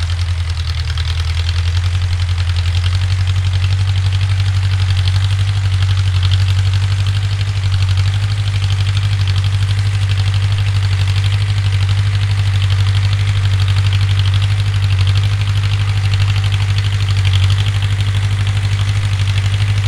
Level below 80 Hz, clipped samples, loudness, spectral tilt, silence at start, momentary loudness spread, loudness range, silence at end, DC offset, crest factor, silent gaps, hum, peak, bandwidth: -28 dBFS; under 0.1%; -15 LUFS; -5 dB/octave; 0 s; 3 LU; 1 LU; 0 s; under 0.1%; 12 dB; none; none; -2 dBFS; 11 kHz